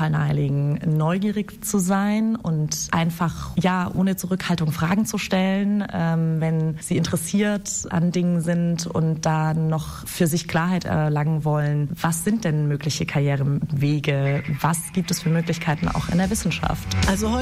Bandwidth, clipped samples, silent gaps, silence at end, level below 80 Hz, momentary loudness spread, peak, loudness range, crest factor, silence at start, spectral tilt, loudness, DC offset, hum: 15.5 kHz; under 0.1%; none; 0 s; -42 dBFS; 3 LU; -8 dBFS; 0 LU; 14 dB; 0 s; -5.5 dB/octave; -22 LUFS; under 0.1%; none